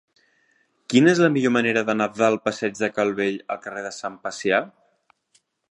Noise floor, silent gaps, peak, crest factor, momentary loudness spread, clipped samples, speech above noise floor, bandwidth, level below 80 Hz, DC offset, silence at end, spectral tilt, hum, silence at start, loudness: -66 dBFS; none; -4 dBFS; 20 dB; 14 LU; under 0.1%; 44 dB; 11 kHz; -68 dBFS; under 0.1%; 1.05 s; -5 dB/octave; none; 0.9 s; -22 LUFS